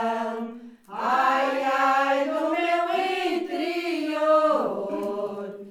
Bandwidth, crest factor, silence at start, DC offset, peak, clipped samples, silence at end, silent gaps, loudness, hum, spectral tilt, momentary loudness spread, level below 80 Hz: 16.5 kHz; 16 dB; 0 s; under 0.1%; -10 dBFS; under 0.1%; 0 s; none; -24 LUFS; none; -4 dB/octave; 11 LU; -74 dBFS